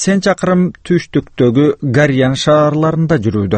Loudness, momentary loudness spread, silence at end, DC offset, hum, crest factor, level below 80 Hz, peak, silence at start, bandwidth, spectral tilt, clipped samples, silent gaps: -13 LUFS; 4 LU; 0 s; under 0.1%; none; 12 dB; -42 dBFS; 0 dBFS; 0 s; 8.8 kHz; -6 dB/octave; under 0.1%; none